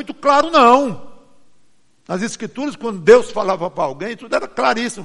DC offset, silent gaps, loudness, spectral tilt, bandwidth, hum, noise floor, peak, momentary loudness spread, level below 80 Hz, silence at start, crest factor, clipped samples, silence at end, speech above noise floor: under 0.1%; none; -16 LUFS; -4.5 dB/octave; 11.5 kHz; none; -56 dBFS; 0 dBFS; 14 LU; -56 dBFS; 0 s; 18 dB; under 0.1%; 0 s; 40 dB